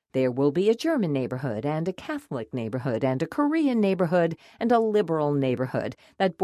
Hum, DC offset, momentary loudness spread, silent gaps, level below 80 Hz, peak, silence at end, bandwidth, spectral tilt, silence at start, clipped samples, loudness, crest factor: none; under 0.1%; 9 LU; none; -64 dBFS; -10 dBFS; 0 s; 13.5 kHz; -7.5 dB/octave; 0.15 s; under 0.1%; -25 LUFS; 16 dB